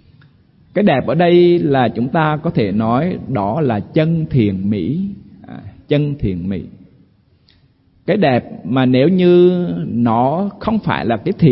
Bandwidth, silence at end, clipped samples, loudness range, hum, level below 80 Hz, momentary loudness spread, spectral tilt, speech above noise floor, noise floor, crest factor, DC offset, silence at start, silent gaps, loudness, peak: 5.6 kHz; 0 s; under 0.1%; 7 LU; none; -44 dBFS; 13 LU; -13 dB/octave; 39 dB; -53 dBFS; 14 dB; under 0.1%; 0.75 s; none; -15 LUFS; -2 dBFS